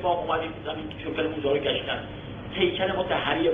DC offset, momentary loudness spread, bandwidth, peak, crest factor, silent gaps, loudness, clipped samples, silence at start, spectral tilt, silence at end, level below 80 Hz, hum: under 0.1%; 9 LU; 4.5 kHz; -10 dBFS; 18 dB; none; -27 LUFS; under 0.1%; 0 s; -7.5 dB/octave; 0 s; -50 dBFS; 50 Hz at -45 dBFS